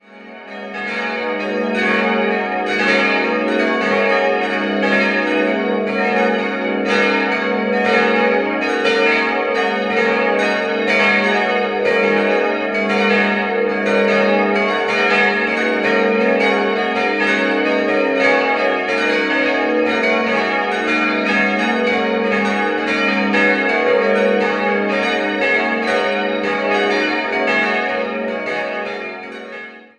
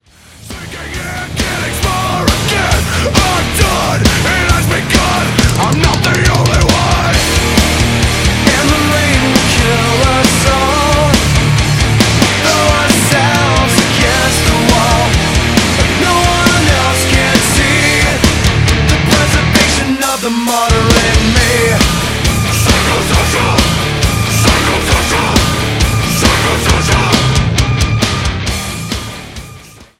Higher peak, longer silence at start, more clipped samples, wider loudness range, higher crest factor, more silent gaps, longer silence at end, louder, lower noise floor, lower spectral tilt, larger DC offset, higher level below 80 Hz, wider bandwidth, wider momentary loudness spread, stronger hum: about the same, 0 dBFS vs 0 dBFS; second, 0.1 s vs 0.4 s; neither; about the same, 2 LU vs 2 LU; first, 16 dB vs 10 dB; neither; about the same, 0.2 s vs 0.15 s; second, -16 LUFS vs -10 LUFS; about the same, -37 dBFS vs -36 dBFS; about the same, -5 dB/octave vs -4 dB/octave; neither; second, -58 dBFS vs -20 dBFS; second, 9.6 kHz vs 16.5 kHz; about the same, 6 LU vs 5 LU; neither